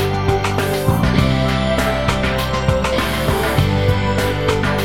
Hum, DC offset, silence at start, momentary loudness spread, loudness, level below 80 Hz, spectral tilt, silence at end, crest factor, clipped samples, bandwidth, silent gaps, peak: none; 1%; 0 s; 2 LU; -17 LUFS; -26 dBFS; -5.5 dB/octave; 0 s; 16 dB; under 0.1%; 17 kHz; none; 0 dBFS